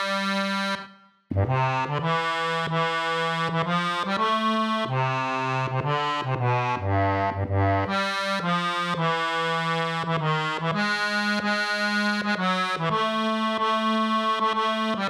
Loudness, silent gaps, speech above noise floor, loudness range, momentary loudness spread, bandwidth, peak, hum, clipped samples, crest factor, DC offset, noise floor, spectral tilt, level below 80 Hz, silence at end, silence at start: -24 LUFS; none; 23 dB; 1 LU; 3 LU; 14.5 kHz; -10 dBFS; none; under 0.1%; 16 dB; under 0.1%; -47 dBFS; -5.5 dB/octave; -62 dBFS; 0 s; 0 s